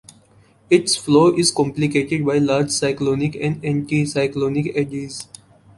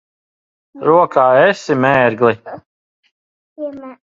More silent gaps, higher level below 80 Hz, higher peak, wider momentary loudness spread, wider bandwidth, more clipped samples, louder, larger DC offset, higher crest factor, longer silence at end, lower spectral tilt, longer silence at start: second, none vs 2.66-3.03 s, 3.11-3.56 s; first, -54 dBFS vs -60 dBFS; about the same, -2 dBFS vs 0 dBFS; second, 9 LU vs 18 LU; first, 11.5 kHz vs 7.8 kHz; neither; second, -19 LUFS vs -13 LUFS; neither; about the same, 18 dB vs 16 dB; first, 0.55 s vs 0.2 s; second, -5 dB/octave vs -6.5 dB/octave; about the same, 0.7 s vs 0.75 s